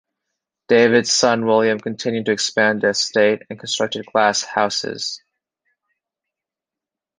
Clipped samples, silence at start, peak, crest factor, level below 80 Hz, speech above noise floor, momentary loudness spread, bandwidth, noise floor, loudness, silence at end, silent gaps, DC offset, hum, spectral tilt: under 0.1%; 0.7 s; -2 dBFS; 18 dB; -64 dBFS; 69 dB; 11 LU; 10.5 kHz; -87 dBFS; -18 LUFS; 2 s; none; under 0.1%; none; -3 dB/octave